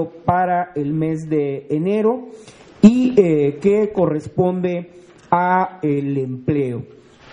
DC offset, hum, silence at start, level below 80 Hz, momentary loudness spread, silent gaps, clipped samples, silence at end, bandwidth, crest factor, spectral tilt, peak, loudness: under 0.1%; none; 0 s; -52 dBFS; 9 LU; none; under 0.1%; 0.45 s; 10 kHz; 18 dB; -8.5 dB/octave; 0 dBFS; -18 LUFS